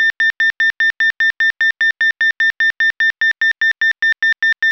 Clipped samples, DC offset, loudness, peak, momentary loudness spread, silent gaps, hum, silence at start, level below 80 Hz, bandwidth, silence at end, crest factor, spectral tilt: under 0.1%; under 0.1%; -13 LUFS; -8 dBFS; 0 LU; none; none; 0 s; -66 dBFS; 5.4 kHz; 0 s; 8 dB; 1.5 dB/octave